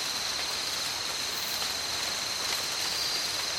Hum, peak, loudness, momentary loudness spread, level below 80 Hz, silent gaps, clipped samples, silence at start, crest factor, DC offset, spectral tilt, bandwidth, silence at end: none; -10 dBFS; -29 LUFS; 2 LU; -60 dBFS; none; under 0.1%; 0 s; 22 dB; under 0.1%; 0.5 dB/octave; 17 kHz; 0 s